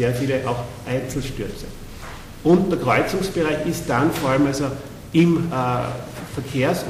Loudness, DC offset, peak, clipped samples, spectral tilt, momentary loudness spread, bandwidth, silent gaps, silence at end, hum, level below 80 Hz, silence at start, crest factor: -21 LUFS; under 0.1%; -6 dBFS; under 0.1%; -6 dB/octave; 15 LU; 16 kHz; none; 0 s; none; -40 dBFS; 0 s; 16 dB